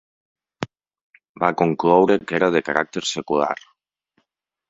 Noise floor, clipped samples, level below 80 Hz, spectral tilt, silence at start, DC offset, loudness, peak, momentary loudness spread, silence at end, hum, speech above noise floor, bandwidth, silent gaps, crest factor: -75 dBFS; under 0.1%; -62 dBFS; -5 dB/octave; 0.6 s; under 0.1%; -20 LUFS; 0 dBFS; 17 LU; 1.15 s; none; 56 dB; 8 kHz; 1.01-1.10 s, 1.29-1.35 s; 22 dB